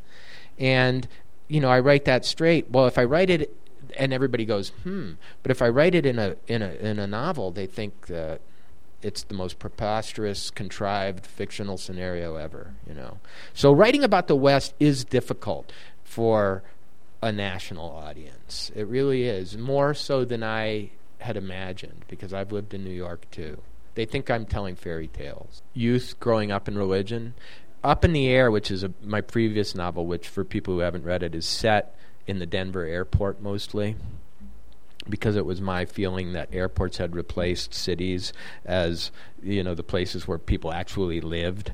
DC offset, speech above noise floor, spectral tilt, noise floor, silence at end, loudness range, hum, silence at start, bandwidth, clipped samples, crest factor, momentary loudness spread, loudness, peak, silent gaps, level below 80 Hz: 2%; 31 dB; -6 dB/octave; -56 dBFS; 0 s; 10 LU; none; 0.25 s; 15 kHz; under 0.1%; 22 dB; 18 LU; -25 LUFS; -4 dBFS; none; -44 dBFS